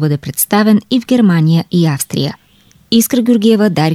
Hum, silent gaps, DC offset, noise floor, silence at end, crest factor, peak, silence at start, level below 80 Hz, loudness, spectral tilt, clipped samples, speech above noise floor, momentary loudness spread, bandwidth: none; none; under 0.1%; -48 dBFS; 0 s; 10 dB; -2 dBFS; 0 s; -54 dBFS; -12 LUFS; -5.5 dB/octave; under 0.1%; 37 dB; 6 LU; 16.5 kHz